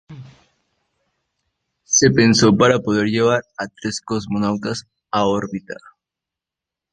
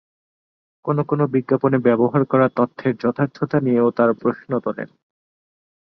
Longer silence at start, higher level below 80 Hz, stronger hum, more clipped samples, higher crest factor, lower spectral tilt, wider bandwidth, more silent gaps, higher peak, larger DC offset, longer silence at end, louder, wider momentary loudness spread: second, 0.1 s vs 0.85 s; first, -50 dBFS vs -62 dBFS; neither; neither; about the same, 18 dB vs 18 dB; second, -4 dB/octave vs -10.5 dB/octave; first, 9.8 kHz vs 6 kHz; neither; about the same, -2 dBFS vs -4 dBFS; neither; about the same, 1.2 s vs 1.1 s; about the same, -17 LUFS vs -19 LUFS; first, 17 LU vs 8 LU